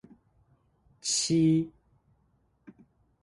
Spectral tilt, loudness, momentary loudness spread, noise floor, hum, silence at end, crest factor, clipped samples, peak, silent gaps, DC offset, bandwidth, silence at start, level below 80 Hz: -4.5 dB/octave; -27 LUFS; 13 LU; -70 dBFS; none; 1.55 s; 16 dB; under 0.1%; -16 dBFS; none; under 0.1%; 11.5 kHz; 1.05 s; -66 dBFS